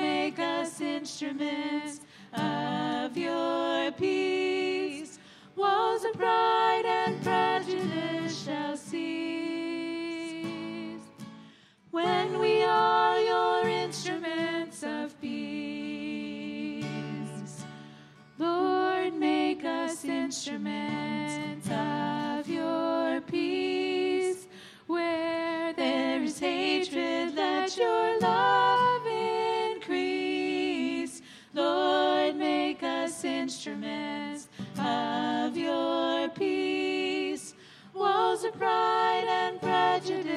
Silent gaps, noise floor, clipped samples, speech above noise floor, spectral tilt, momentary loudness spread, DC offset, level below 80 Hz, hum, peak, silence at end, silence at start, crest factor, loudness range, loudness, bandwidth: none; -56 dBFS; under 0.1%; 27 dB; -4.5 dB/octave; 11 LU; under 0.1%; -74 dBFS; none; -12 dBFS; 0 s; 0 s; 16 dB; 7 LU; -29 LUFS; 13.5 kHz